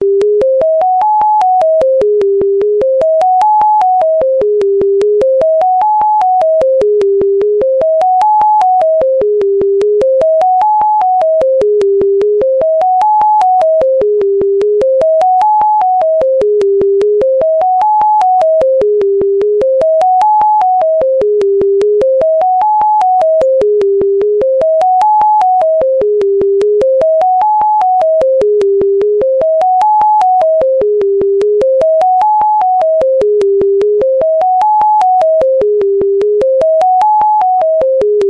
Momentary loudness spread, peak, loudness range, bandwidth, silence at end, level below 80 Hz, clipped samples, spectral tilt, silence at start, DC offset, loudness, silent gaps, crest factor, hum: 2 LU; -2 dBFS; 0 LU; 8.4 kHz; 0 s; -46 dBFS; under 0.1%; -6.5 dB/octave; 0 s; under 0.1%; -10 LUFS; none; 8 dB; none